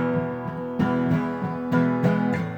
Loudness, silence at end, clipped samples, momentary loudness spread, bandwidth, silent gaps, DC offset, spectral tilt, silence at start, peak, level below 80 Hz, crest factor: -24 LUFS; 0 s; under 0.1%; 8 LU; 8.2 kHz; none; under 0.1%; -9 dB/octave; 0 s; -8 dBFS; -56 dBFS; 14 dB